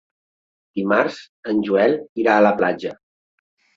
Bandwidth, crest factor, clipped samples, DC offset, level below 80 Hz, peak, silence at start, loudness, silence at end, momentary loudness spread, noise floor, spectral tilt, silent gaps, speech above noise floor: 7.6 kHz; 18 dB; under 0.1%; under 0.1%; -64 dBFS; -2 dBFS; 0.75 s; -19 LUFS; 0.85 s; 15 LU; under -90 dBFS; -7 dB/octave; 1.29-1.43 s, 2.09-2.16 s; over 71 dB